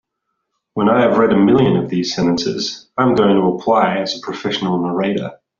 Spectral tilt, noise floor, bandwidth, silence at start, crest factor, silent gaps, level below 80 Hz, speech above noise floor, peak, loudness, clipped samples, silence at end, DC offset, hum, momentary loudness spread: -5 dB/octave; -74 dBFS; 7.4 kHz; 0.75 s; 14 dB; none; -52 dBFS; 59 dB; -2 dBFS; -16 LUFS; under 0.1%; 0.25 s; under 0.1%; none; 10 LU